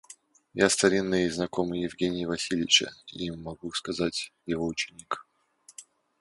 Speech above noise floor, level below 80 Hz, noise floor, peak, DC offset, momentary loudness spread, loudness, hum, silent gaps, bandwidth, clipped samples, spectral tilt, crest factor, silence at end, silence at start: 31 dB; -58 dBFS; -60 dBFS; -4 dBFS; under 0.1%; 16 LU; -28 LUFS; none; none; 11.5 kHz; under 0.1%; -3 dB/octave; 24 dB; 0.4 s; 0.1 s